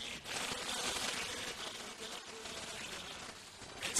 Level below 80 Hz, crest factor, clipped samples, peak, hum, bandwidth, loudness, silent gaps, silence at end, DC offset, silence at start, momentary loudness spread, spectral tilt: -66 dBFS; 24 dB; under 0.1%; -18 dBFS; none; 14.5 kHz; -41 LUFS; none; 0 s; under 0.1%; 0 s; 10 LU; -0.5 dB/octave